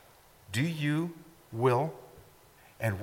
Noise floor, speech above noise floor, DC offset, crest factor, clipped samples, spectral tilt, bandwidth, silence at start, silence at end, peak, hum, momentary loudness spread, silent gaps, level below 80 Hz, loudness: -58 dBFS; 29 dB; under 0.1%; 18 dB; under 0.1%; -6.5 dB/octave; 17 kHz; 0.5 s; 0 s; -14 dBFS; none; 17 LU; none; -66 dBFS; -31 LUFS